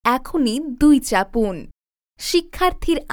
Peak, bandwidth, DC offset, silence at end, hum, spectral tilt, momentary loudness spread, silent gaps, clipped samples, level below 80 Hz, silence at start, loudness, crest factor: -2 dBFS; 19.5 kHz; under 0.1%; 0 s; none; -4 dB/octave; 9 LU; none; under 0.1%; -34 dBFS; 0.05 s; -19 LUFS; 16 dB